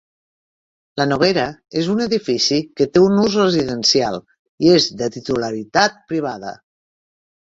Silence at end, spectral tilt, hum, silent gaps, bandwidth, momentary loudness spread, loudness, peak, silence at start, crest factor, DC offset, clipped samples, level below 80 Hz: 1 s; -4.5 dB/octave; none; 4.39-4.58 s; 7.8 kHz; 10 LU; -17 LUFS; 0 dBFS; 0.95 s; 18 dB; under 0.1%; under 0.1%; -54 dBFS